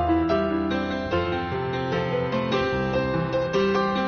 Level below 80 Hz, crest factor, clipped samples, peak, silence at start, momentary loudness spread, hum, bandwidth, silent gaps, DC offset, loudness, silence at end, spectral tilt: -42 dBFS; 14 dB; under 0.1%; -10 dBFS; 0 s; 4 LU; none; 6.6 kHz; none; under 0.1%; -25 LUFS; 0 s; -5 dB/octave